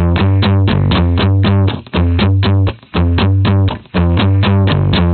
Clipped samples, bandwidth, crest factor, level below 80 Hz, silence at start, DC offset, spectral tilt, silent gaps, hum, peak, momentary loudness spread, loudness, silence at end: under 0.1%; 4.5 kHz; 10 dB; -24 dBFS; 0 s; under 0.1%; -6 dB/octave; none; none; 0 dBFS; 4 LU; -13 LUFS; 0 s